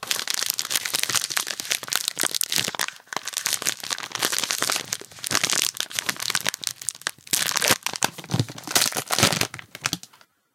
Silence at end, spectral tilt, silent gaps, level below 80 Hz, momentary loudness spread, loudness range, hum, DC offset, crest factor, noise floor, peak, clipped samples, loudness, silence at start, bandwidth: 0.5 s; -1 dB/octave; none; -66 dBFS; 8 LU; 2 LU; none; under 0.1%; 26 dB; -55 dBFS; 0 dBFS; under 0.1%; -24 LUFS; 0 s; 17 kHz